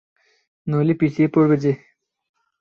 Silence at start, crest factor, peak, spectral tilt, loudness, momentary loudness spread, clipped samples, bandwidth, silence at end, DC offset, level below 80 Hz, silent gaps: 0.65 s; 16 dB; -6 dBFS; -9.5 dB/octave; -19 LUFS; 11 LU; under 0.1%; 6.8 kHz; 0.85 s; under 0.1%; -60 dBFS; none